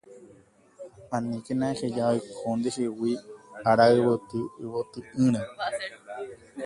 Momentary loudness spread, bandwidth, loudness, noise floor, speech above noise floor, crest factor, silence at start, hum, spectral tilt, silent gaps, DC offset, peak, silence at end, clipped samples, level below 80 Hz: 19 LU; 11.5 kHz; -27 LUFS; -57 dBFS; 31 dB; 20 dB; 0.1 s; none; -6 dB/octave; none; under 0.1%; -8 dBFS; 0 s; under 0.1%; -64 dBFS